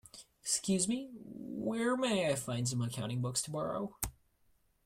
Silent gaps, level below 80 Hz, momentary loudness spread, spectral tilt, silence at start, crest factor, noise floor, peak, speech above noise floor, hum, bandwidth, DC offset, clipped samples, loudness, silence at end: none; -60 dBFS; 12 LU; -4 dB/octave; 0.15 s; 20 dB; -72 dBFS; -16 dBFS; 37 dB; none; 16 kHz; under 0.1%; under 0.1%; -35 LUFS; 0.75 s